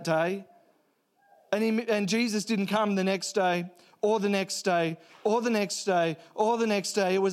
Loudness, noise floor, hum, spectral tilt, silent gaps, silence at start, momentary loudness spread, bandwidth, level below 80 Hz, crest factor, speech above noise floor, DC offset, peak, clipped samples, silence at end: -28 LUFS; -70 dBFS; none; -4.5 dB/octave; none; 0 s; 5 LU; 15.5 kHz; -82 dBFS; 16 dB; 43 dB; under 0.1%; -12 dBFS; under 0.1%; 0 s